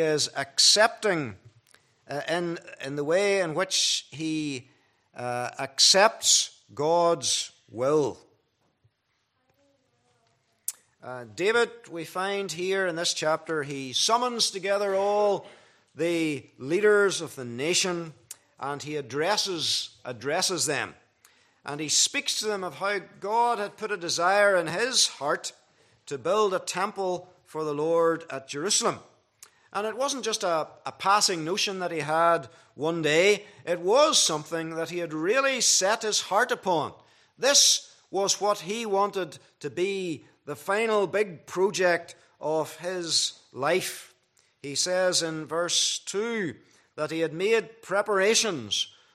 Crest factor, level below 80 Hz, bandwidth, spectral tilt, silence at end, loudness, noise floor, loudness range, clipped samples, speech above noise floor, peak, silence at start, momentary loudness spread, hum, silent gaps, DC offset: 22 dB; -80 dBFS; 15 kHz; -2 dB/octave; 0.25 s; -25 LUFS; -74 dBFS; 5 LU; under 0.1%; 48 dB; -4 dBFS; 0 s; 15 LU; none; none; under 0.1%